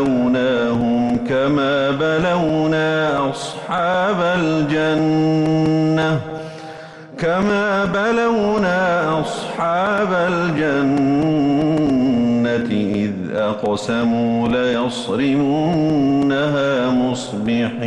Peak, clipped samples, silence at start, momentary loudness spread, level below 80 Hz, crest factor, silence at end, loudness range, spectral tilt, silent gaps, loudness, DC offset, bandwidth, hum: -10 dBFS; under 0.1%; 0 s; 5 LU; -48 dBFS; 8 dB; 0 s; 1 LU; -6.5 dB/octave; none; -18 LUFS; under 0.1%; 11.5 kHz; none